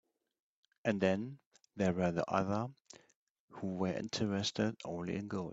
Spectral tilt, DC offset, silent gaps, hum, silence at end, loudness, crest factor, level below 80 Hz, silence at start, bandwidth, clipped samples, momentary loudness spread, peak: -5.5 dB/octave; under 0.1%; 1.46-1.51 s, 3.15-3.48 s; none; 0 s; -37 LUFS; 22 dB; -70 dBFS; 0.85 s; 8 kHz; under 0.1%; 9 LU; -16 dBFS